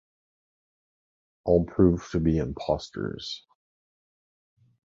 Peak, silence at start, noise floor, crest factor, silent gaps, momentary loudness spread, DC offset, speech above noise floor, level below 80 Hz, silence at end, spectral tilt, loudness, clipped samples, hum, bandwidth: -8 dBFS; 1.45 s; under -90 dBFS; 22 dB; none; 14 LU; under 0.1%; over 65 dB; -44 dBFS; 1.45 s; -7.5 dB/octave; -26 LUFS; under 0.1%; none; 7.6 kHz